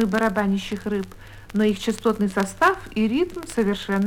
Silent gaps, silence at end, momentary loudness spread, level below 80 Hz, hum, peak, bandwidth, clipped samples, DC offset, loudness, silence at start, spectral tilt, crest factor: none; 0 s; 7 LU; -46 dBFS; none; -6 dBFS; 16.5 kHz; under 0.1%; under 0.1%; -23 LUFS; 0 s; -5.5 dB/octave; 18 dB